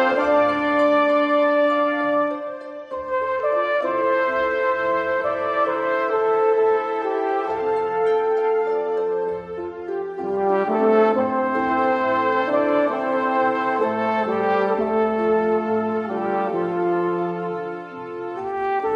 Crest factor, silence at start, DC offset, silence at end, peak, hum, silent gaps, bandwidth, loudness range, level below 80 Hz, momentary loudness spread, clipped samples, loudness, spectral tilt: 14 dB; 0 s; under 0.1%; 0 s; -6 dBFS; none; none; 7.2 kHz; 3 LU; -62 dBFS; 10 LU; under 0.1%; -21 LUFS; -7 dB/octave